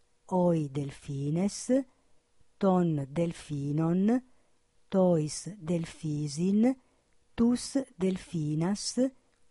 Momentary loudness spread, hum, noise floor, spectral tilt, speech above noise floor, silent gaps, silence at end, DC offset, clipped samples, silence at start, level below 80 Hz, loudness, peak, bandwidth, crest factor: 9 LU; none; -66 dBFS; -6.5 dB/octave; 38 dB; none; 0.4 s; under 0.1%; under 0.1%; 0.3 s; -60 dBFS; -30 LUFS; -14 dBFS; 11.5 kHz; 16 dB